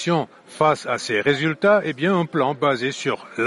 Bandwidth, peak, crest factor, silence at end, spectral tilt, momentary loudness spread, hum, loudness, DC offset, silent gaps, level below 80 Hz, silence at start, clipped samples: 11.5 kHz; -6 dBFS; 16 dB; 0 s; -5.5 dB/octave; 6 LU; none; -21 LUFS; under 0.1%; none; -64 dBFS; 0 s; under 0.1%